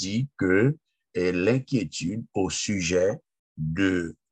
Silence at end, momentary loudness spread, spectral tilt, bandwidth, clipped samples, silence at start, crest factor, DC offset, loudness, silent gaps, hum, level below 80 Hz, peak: 0.2 s; 9 LU; -5 dB/octave; 9.4 kHz; under 0.1%; 0 s; 16 dB; under 0.1%; -26 LUFS; 3.39-3.55 s; none; -54 dBFS; -10 dBFS